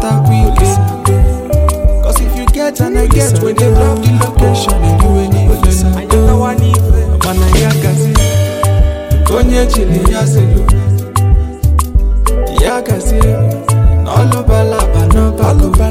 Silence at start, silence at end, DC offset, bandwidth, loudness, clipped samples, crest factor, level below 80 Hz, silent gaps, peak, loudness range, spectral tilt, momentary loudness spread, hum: 0 s; 0 s; under 0.1%; 16 kHz; -11 LUFS; under 0.1%; 8 dB; -12 dBFS; none; 0 dBFS; 2 LU; -6 dB/octave; 3 LU; none